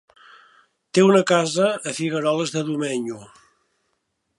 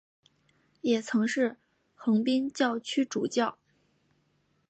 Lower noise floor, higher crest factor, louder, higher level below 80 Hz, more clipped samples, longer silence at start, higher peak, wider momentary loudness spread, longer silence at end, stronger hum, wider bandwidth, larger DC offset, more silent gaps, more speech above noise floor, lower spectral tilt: about the same, -73 dBFS vs -72 dBFS; about the same, 18 dB vs 18 dB; first, -20 LUFS vs -29 LUFS; first, -72 dBFS vs -80 dBFS; neither; about the same, 0.95 s vs 0.85 s; first, -4 dBFS vs -14 dBFS; first, 11 LU vs 6 LU; about the same, 1.15 s vs 1.15 s; neither; first, 11.5 kHz vs 8.8 kHz; neither; neither; first, 53 dB vs 44 dB; about the same, -5 dB/octave vs -4.5 dB/octave